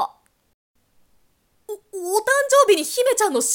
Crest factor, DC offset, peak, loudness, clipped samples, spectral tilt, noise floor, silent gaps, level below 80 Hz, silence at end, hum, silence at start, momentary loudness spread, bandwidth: 18 dB; under 0.1%; -4 dBFS; -18 LUFS; under 0.1%; 0 dB/octave; -64 dBFS; 0.54-0.74 s; -70 dBFS; 0 s; none; 0 s; 19 LU; 18 kHz